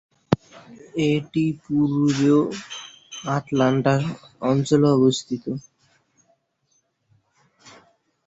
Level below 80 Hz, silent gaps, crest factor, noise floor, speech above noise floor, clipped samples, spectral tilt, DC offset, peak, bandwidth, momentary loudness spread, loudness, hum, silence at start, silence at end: -58 dBFS; none; 22 dB; -69 dBFS; 48 dB; under 0.1%; -6.5 dB/octave; under 0.1%; -2 dBFS; 8 kHz; 15 LU; -22 LUFS; none; 0.3 s; 2.65 s